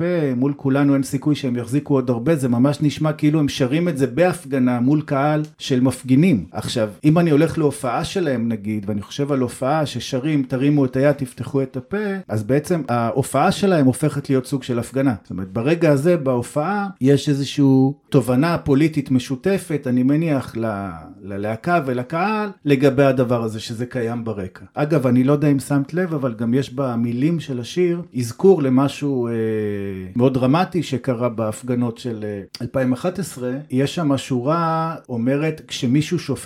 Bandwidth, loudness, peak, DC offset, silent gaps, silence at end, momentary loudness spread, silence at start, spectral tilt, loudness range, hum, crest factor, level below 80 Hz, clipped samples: 15 kHz; -20 LUFS; -2 dBFS; under 0.1%; none; 0 s; 9 LU; 0 s; -7 dB/octave; 3 LU; none; 18 dB; -54 dBFS; under 0.1%